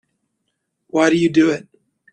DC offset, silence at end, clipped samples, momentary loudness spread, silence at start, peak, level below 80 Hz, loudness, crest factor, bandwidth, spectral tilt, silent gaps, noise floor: under 0.1%; 0.55 s; under 0.1%; 10 LU; 0.95 s; -2 dBFS; -60 dBFS; -17 LUFS; 18 dB; 9.2 kHz; -5.5 dB/octave; none; -74 dBFS